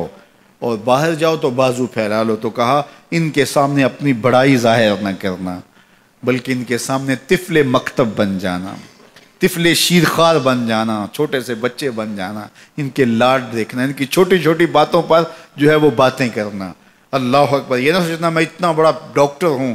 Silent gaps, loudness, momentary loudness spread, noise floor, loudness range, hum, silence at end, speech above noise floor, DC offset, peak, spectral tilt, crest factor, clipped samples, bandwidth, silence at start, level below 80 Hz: none; -15 LUFS; 11 LU; -50 dBFS; 4 LU; none; 0 s; 35 dB; under 0.1%; -2 dBFS; -5 dB/octave; 14 dB; under 0.1%; 16 kHz; 0 s; -52 dBFS